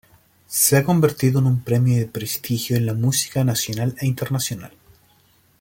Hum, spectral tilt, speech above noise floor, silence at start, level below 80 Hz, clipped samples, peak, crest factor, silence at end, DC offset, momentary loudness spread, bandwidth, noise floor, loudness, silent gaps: none; -5 dB/octave; 38 dB; 0.5 s; -54 dBFS; under 0.1%; -2 dBFS; 18 dB; 0.9 s; under 0.1%; 9 LU; 17 kHz; -58 dBFS; -20 LUFS; none